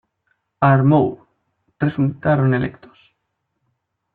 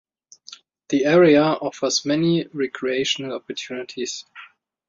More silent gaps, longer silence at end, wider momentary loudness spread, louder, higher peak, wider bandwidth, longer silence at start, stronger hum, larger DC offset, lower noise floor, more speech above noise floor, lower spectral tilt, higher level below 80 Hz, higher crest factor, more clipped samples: neither; first, 1.45 s vs 0.45 s; second, 9 LU vs 16 LU; first, -18 LUFS vs -21 LUFS; about the same, -2 dBFS vs -4 dBFS; second, 4.2 kHz vs 7.8 kHz; about the same, 0.6 s vs 0.5 s; neither; neither; first, -74 dBFS vs -47 dBFS; first, 58 dB vs 27 dB; first, -12 dB/octave vs -4.5 dB/octave; first, -54 dBFS vs -64 dBFS; about the same, 18 dB vs 18 dB; neither